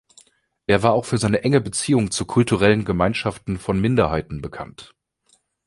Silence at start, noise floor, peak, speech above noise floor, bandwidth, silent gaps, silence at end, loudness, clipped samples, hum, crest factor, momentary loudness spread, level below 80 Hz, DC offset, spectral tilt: 0.7 s; -63 dBFS; -2 dBFS; 43 dB; 11.5 kHz; none; 0.8 s; -20 LUFS; under 0.1%; none; 18 dB; 14 LU; -42 dBFS; under 0.1%; -5.5 dB/octave